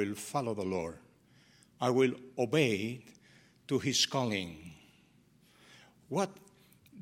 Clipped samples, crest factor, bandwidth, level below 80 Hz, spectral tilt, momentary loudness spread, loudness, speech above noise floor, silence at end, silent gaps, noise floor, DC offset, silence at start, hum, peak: under 0.1%; 22 dB; 16.5 kHz; -70 dBFS; -4 dB/octave; 15 LU; -33 LUFS; 33 dB; 0 s; none; -65 dBFS; under 0.1%; 0 s; none; -14 dBFS